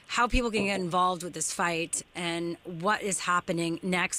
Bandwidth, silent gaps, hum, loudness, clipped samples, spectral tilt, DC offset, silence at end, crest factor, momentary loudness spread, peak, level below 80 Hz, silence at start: 16 kHz; none; none; -29 LUFS; under 0.1%; -3.5 dB/octave; under 0.1%; 0 s; 16 dB; 6 LU; -12 dBFS; -42 dBFS; 0.1 s